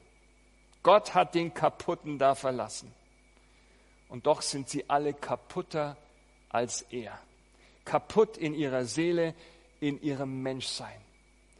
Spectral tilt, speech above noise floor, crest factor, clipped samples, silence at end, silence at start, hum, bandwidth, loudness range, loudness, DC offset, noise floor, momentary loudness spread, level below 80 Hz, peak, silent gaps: -4.5 dB/octave; 32 dB; 24 dB; under 0.1%; 0.6 s; 0.85 s; none; 11.5 kHz; 5 LU; -30 LUFS; under 0.1%; -62 dBFS; 13 LU; -64 dBFS; -8 dBFS; none